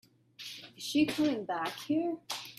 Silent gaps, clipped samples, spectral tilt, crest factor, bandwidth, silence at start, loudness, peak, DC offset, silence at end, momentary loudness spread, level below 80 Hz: none; under 0.1%; -4 dB/octave; 18 dB; 14.5 kHz; 0.4 s; -33 LUFS; -16 dBFS; under 0.1%; 0.05 s; 15 LU; -74 dBFS